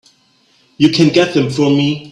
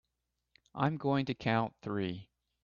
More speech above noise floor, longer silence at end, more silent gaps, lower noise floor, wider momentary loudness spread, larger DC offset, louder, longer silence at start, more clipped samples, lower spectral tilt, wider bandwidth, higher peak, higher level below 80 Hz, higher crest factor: second, 42 dB vs 52 dB; second, 0.05 s vs 0.4 s; neither; second, -54 dBFS vs -85 dBFS; second, 4 LU vs 10 LU; neither; first, -13 LUFS vs -34 LUFS; about the same, 0.8 s vs 0.75 s; neither; second, -6 dB/octave vs -8 dB/octave; first, 10.5 kHz vs 7 kHz; first, 0 dBFS vs -16 dBFS; first, -52 dBFS vs -70 dBFS; second, 14 dB vs 20 dB